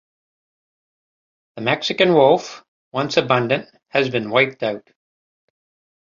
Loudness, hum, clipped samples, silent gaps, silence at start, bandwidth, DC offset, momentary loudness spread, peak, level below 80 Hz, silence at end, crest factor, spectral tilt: -19 LUFS; none; under 0.1%; 2.68-2.91 s; 1.55 s; 7.6 kHz; under 0.1%; 12 LU; -2 dBFS; -64 dBFS; 1.25 s; 20 dB; -5 dB/octave